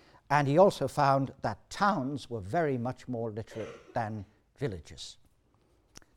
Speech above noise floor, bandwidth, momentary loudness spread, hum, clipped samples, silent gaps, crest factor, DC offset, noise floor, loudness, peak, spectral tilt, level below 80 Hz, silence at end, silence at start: 38 dB; 15 kHz; 18 LU; none; under 0.1%; none; 22 dB; under 0.1%; -68 dBFS; -30 LUFS; -10 dBFS; -6.5 dB/octave; -60 dBFS; 1.05 s; 0.3 s